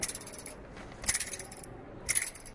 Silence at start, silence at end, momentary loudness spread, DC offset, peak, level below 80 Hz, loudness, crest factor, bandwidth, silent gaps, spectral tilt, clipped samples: 0 s; 0 s; 17 LU; under 0.1%; -12 dBFS; -54 dBFS; -33 LUFS; 26 dB; 11.5 kHz; none; -1 dB/octave; under 0.1%